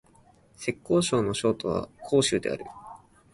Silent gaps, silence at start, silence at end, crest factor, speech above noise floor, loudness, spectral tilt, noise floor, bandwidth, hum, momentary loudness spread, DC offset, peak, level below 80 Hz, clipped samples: none; 0.6 s; 0.4 s; 18 dB; 32 dB; -27 LUFS; -4.5 dB/octave; -59 dBFS; 11.5 kHz; none; 16 LU; under 0.1%; -10 dBFS; -56 dBFS; under 0.1%